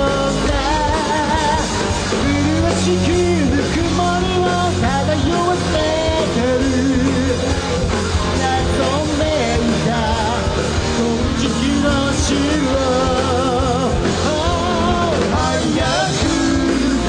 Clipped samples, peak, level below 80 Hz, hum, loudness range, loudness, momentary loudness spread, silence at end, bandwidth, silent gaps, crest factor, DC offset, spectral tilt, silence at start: under 0.1%; -4 dBFS; -28 dBFS; none; 1 LU; -17 LUFS; 2 LU; 0 s; 10.5 kHz; none; 12 dB; under 0.1%; -5 dB/octave; 0 s